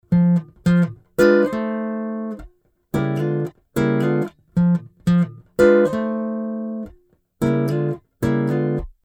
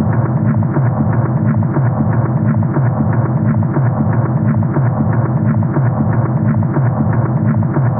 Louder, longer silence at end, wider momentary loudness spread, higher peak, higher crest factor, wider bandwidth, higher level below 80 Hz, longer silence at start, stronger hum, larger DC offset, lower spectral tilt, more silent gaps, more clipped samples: second, -20 LUFS vs -14 LUFS; first, 0.15 s vs 0 s; first, 12 LU vs 1 LU; about the same, -2 dBFS vs -2 dBFS; first, 18 dB vs 10 dB; first, 15.5 kHz vs 2.5 kHz; second, -46 dBFS vs -38 dBFS; about the same, 0.1 s vs 0 s; neither; neither; about the same, -8.5 dB/octave vs -8.5 dB/octave; neither; neither